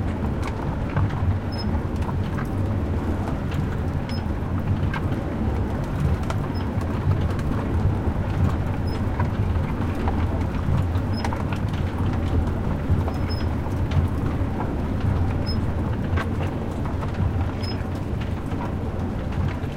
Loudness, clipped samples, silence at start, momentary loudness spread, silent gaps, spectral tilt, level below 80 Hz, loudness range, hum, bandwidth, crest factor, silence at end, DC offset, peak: -25 LUFS; under 0.1%; 0 s; 4 LU; none; -8 dB/octave; -30 dBFS; 2 LU; none; 11 kHz; 14 dB; 0 s; under 0.1%; -8 dBFS